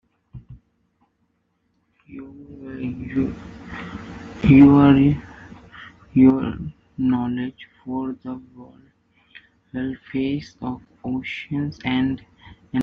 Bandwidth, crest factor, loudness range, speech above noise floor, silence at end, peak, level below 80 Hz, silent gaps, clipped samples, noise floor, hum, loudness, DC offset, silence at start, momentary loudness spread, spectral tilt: 5.6 kHz; 20 dB; 15 LU; 50 dB; 0 s; -2 dBFS; -46 dBFS; none; under 0.1%; -69 dBFS; none; -20 LUFS; under 0.1%; 0.35 s; 26 LU; -7 dB/octave